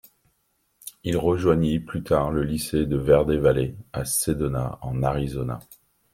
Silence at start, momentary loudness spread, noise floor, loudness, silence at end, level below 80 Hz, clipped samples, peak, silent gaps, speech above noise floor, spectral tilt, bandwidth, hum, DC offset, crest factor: 0.85 s; 12 LU; -70 dBFS; -24 LUFS; 0.55 s; -40 dBFS; under 0.1%; -4 dBFS; none; 47 dB; -6 dB/octave; 16.5 kHz; none; under 0.1%; 20 dB